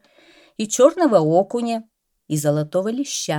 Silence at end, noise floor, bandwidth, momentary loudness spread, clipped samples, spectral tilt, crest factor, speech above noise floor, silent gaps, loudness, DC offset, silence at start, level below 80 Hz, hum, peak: 0 s; -52 dBFS; 17.5 kHz; 13 LU; under 0.1%; -5 dB/octave; 18 dB; 34 dB; none; -19 LUFS; under 0.1%; 0.6 s; -70 dBFS; none; -2 dBFS